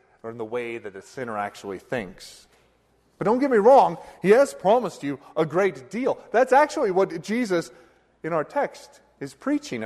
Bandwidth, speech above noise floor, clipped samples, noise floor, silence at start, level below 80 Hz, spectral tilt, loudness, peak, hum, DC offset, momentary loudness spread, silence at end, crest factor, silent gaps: 13 kHz; 40 dB; under 0.1%; -63 dBFS; 0.25 s; -64 dBFS; -5.5 dB/octave; -23 LUFS; -6 dBFS; none; under 0.1%; 18 LU; 0 s; 18 dB; none